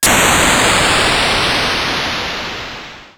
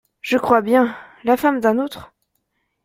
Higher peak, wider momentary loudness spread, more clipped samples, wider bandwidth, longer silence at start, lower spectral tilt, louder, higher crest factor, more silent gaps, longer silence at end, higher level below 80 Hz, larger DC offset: about the same, 0 dBFS vs -2 dBFS; about the same, 14 LU vs 12 LU; neither; first, over 20 kHz vs 16.5 kHz; second, 0 s vs 0.25 s; second, -2 dB/octave vs -5.5 dB/octave; first, -12 LUFS vs -18 LUFS; about the same, 14 dB vs 18 dB; neither; second, 0.1 s vs 0.8 s; first, -32 dBFS vs -58 dBFS; neither